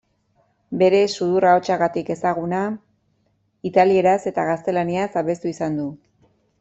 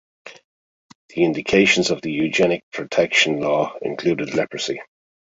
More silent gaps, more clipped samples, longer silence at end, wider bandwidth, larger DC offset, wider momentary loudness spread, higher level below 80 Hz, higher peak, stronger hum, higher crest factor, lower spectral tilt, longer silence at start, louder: second, none vs 0.44-1.09 s, 2.63-2.72 s; neither; first, 0.65 s vs 0.4 s; about the same, 8.2 kHz vs 8 kHz; neither; about the same, 11 LU vs 10 LU; second, -62 dBFS vs -56 dBFS; about the same, -2 dBFS vs -2 dBFS; neither; about the same, 18 dB vs 20 dB; first, -6 dB/octave vs -4 dB/octave; first, 0.7 s vs 0.25 s; about the same, -20 LUFS vs -19 LUFS